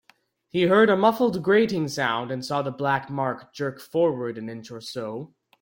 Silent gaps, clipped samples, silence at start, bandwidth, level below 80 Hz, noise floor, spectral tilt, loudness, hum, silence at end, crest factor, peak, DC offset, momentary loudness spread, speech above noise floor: none; under 0.1%; 0.55 s; 17 kHz; -66 dBFS; -62 dBFS; -6 dB/octave; -24 LUFS; none; 0.35 s; 18 dB; -6 dBFS; under 0.1%; 16 LU; 38 dB